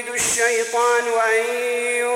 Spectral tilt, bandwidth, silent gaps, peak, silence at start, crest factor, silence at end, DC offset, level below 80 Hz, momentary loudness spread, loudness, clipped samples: 0 dB/octave; 16.5 kHz; none; -8 dBFS; 0 s; 12 dB; 0 s; under 0.1%; -60 dBFS; 3 LU; -19 LUFS; under 0.1%